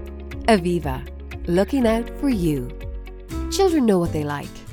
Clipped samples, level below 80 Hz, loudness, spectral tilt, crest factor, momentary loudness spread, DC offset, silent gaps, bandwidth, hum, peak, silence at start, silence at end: under 0.1%; -34 dBFS; -21 LUFS; -6 dB/octave; 20 dB; 16 LU; under 0.1%; none; 18.5 kHz; none; -2 dBFS; 0 s; 0 s